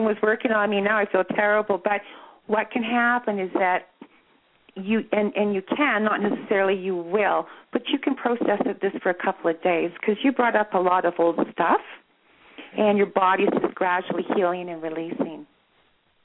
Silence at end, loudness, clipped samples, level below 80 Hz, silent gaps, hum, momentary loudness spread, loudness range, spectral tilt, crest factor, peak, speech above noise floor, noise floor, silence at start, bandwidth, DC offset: 0.8 s; -23 LUFS; under 0.1%; -72 dBFS; none; none; 8 LU; 2 LU; -9.5 dB/octave; 16 dB; -8 dBFS; 41 dB; -64 dBFS; 0 s; 4.1 kHz; under 0.1%